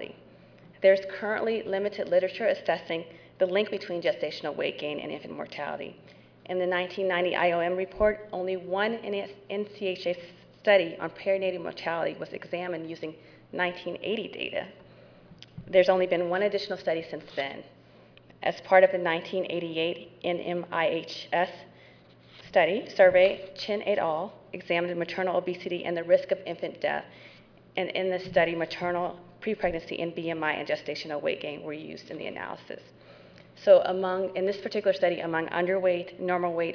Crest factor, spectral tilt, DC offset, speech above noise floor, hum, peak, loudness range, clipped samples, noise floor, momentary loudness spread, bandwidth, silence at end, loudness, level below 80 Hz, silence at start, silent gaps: 22 dB; -6 dB/octave; under 0.1%; 27 dB; none; -6 dBFS; 6 LU; under 0.1%; -55 dBFS; 14 LU; 5.4 kHz; 0 s; -28 LUFS; -62 dBFS; 0 s; none